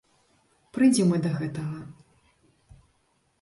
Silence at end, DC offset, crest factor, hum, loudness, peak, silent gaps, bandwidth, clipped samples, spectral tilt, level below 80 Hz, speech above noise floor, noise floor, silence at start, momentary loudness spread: 1.5 s; under 0.1%; 18 dB; none; -25 LUFS; -10 dBFS; none; 11.5 kHz; under 0.1%; -6 dB/octave; -64 dBFS; 46 dB; -69 dBFS; 0.75 s; 19 LU